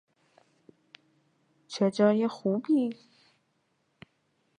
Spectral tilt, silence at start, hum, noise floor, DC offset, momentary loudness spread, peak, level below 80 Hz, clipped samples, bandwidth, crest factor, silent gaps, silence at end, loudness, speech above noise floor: -7 dB/octave; 1.7 s; none; -74 dBFS; under 0.1%; 14 LU; -10 dBFS; -82 dBFS; under 0.1%; 10 kHz; 22 dB; none; 1.65 s; -27 LUFS; 48 dB